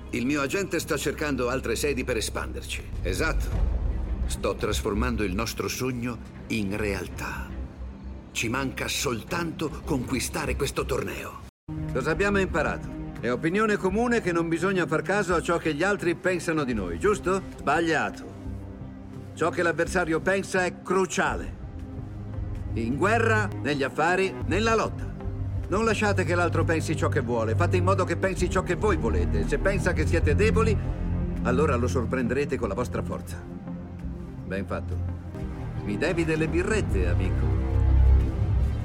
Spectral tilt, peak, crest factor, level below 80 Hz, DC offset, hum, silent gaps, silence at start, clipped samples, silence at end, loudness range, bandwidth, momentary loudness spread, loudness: -5.5 dB/octave; -10 dBFS; 16 dB; -34 dBFS; under 0.1%; none; 11.49-11.67 s; 0 s; under 0.1%; 0 s; 5 LU; 16.5 kHz; 12 LU; -26 LUFS